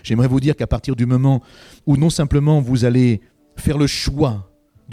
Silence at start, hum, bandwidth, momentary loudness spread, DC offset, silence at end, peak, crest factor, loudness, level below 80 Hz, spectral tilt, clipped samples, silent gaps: 0.05 s; none; 14.5 kHz; 7 LU; under 0.1%; 0 s; -4 dBFS; 14 dB; -17 LUFS; -34 dBFS; -7 dB/octave; under 0.1%; none